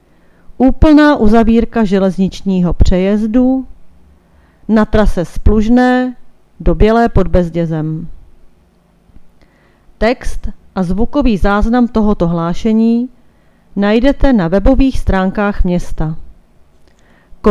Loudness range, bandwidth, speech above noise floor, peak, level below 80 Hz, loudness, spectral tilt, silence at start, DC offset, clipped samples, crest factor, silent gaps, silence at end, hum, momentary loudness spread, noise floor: 7 LU; 11 kHz; 40 dB; 0 dBFS; -20 dBFS; -13 LUFS; -8 dB/octave; 0.5 s; under 0.1%; 0.3%; 12 dB; none; 0 s; none; 11 LU; -50 dBFS